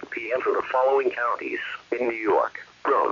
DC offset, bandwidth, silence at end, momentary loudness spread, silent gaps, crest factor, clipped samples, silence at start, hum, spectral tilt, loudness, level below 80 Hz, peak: under 0.1%; 7.2 kHz; 0 s; 8 LU; none; 14 dB; under 0.1%; 0 s; 60 Hz at -65 dBFS; -5 dB/octave; -25 LUFS; -68 dBFS; -10 dBFS